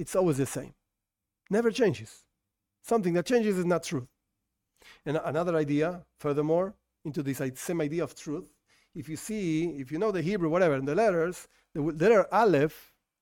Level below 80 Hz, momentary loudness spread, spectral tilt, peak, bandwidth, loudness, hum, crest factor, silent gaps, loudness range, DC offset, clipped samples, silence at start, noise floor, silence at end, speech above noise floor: -62 dBFS; 15 LU; -6 dB/octave; -12 dBFS; 17.5 kHz; -28 LUFS; none; 18 dB; none; 6 LU; under 0.1%; under 0.1%; 0 s; -87 dBFS; 0.4 s; 59 dB